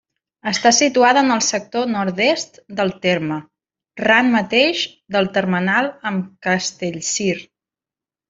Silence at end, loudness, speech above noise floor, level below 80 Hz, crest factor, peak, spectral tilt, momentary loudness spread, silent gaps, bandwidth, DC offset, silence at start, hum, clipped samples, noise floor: 0.85 s; -17 LUFS; 72 dB; -60 dBFS; 18 dB; -2 dBFS; -3 dB/octave; 11 LU; none; 7.8 kHz; under 0.1%; 0.45 s; none; under 0.1%; -90 dBFS